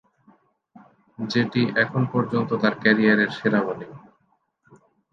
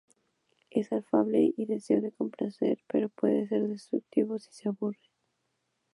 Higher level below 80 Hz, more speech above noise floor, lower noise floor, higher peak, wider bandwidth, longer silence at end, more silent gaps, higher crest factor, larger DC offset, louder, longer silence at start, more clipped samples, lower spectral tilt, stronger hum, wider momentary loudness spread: first, -66 dBFS vs -80 dBFS; about the same, 47 dB vs 50 dB; second, -68 dBFS vs -79 dBFS; first, -2 dBFS vs -10 dBFS; second, 7 kHz vs 11.5 kHz; first, 1.15 s vs 1 s; neither; about the same, 22 dB vs 20 dB; neither; first, -21 LUFS vs -30 LUFS; first, 1.2 s vs 0.75 s; neither; about the same, -7 dB/octave vs -8 dB/octave; neither; first, 12 LU vs 8 LU